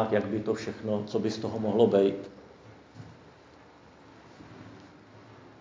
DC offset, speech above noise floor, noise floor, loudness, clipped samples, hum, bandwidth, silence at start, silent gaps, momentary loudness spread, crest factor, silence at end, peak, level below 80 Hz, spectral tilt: under 0.1%; 27 dB; -54 dBFS; -28 LUFS; under 0.1%; none; 7.6 kHz; 0 s; none; 28 LU; 22 dB; 0.1 s; -10 dBFS; -64 dBFS; -7 dB/octave